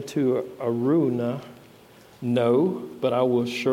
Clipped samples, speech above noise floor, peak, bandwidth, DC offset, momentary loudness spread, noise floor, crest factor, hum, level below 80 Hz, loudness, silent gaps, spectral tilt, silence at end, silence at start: under 0.1%; 27 dB; -10 dBFS; 16 kHz; under 0.1%; 7 LU; -51 dBFS; 14 dB; none; -68 dBFS; -24 LUFS; none; -7 dB/octave; 0 s; 0 s